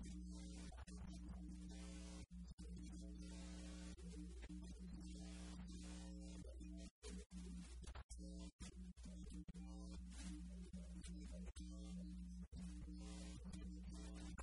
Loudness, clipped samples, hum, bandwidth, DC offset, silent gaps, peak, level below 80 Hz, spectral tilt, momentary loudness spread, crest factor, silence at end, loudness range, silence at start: -56 LUFS; under 0.1%; none; 11 kHz; under 0.1%; 2.53-2.58 s, 6.91-7.02 s, 7.26-7.30 s, 8.04-8.09 s, 8.52-8.59 s; -42 dBFS; -56 dBFS; -5.5 dB/octave; 2 LU; 12 dB; 0 s; 1 LU; 0 s